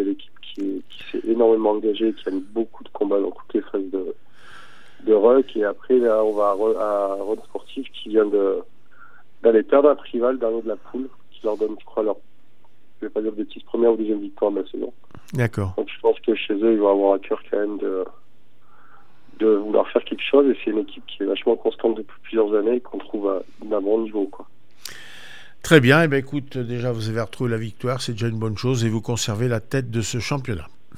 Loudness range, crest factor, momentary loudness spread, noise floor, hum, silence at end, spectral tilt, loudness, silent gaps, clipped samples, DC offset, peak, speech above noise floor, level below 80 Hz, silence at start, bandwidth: 5 LU; 22 dB; 15 LU; -61 dBFS; none; 0.3 s; -6 dB/octave; -22 LUFS; none; under 0.1%; 2%; 0 dBFS; 40 dB; -58 dBFS; 0 s; 15 kHz